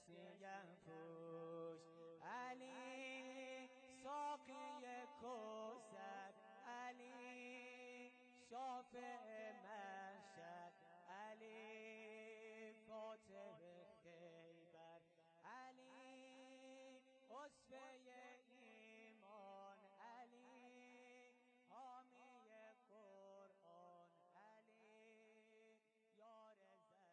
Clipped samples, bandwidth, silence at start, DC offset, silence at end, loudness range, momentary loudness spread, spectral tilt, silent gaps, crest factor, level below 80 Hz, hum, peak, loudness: under 0.1%; 9 kHz; 0 s; under 0.1%; 0 s; 12 LU; 13 LU; -4 dB/octave; none; 16 dB; under -90 dBFS; none; -42 dBFS; -59 LUFS